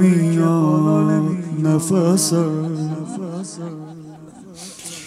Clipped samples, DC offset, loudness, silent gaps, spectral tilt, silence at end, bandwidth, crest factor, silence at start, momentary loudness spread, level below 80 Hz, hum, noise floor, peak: under 0.1%; under 0.1%; -18 LUFS; none; -6.5 dB/octave; 0 s; 15.5 kHz; 14 dB; 0 s; 20 LU; -68 dBFS; none; -39 dBFS; -4 dBFS